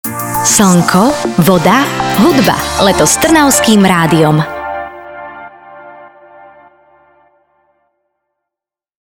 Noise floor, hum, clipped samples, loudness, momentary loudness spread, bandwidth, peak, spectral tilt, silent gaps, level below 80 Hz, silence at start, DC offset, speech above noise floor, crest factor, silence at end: -84 dBFS; none; under 0.1%; -9 LUFS; 18 LU; over 20 kHz; 0 dBFS; -4 dB/octave; none; -38 dBFS; 0.05 s; under 0.1%; 76 dB; 12 dB; 3 s